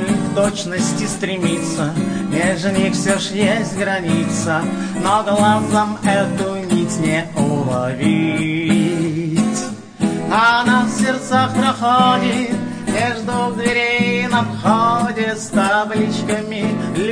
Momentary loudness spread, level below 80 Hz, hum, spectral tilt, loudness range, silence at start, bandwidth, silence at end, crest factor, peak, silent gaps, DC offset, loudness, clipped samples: 6 LU; -50 dBFS; none; -5 dB/octave; 2 LU; 0 s; 10.5 kHz; 0 s; 16 dB; -2 dBFS; none; under 0.1%; -17 LUFS; under 0.1%